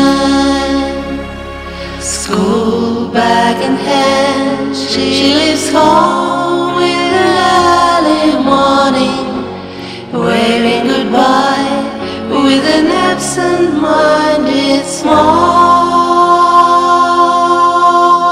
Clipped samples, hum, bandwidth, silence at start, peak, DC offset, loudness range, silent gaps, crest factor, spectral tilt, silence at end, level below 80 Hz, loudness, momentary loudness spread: 0.4%; none; 15 kHz; 0 s; 0 dBFS; under 0.1%; 4 LU; none; 10 dB; -4 dB/octave; 0 s; -38 dBFS; -10 LUFS; 10 LU